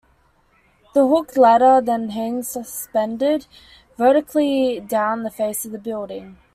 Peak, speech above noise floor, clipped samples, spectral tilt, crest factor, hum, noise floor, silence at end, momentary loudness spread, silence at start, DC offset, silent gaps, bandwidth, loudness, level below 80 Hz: -4 dBFS; 40 dB; under 0.1%; -4.5 dB/octave; 16 dB; none; -59 dBFS; 0.2 s; 14 LU; 0.95 s; under 0.1%; none; 15.5 kHz; -19 LUFS; -60 dBFS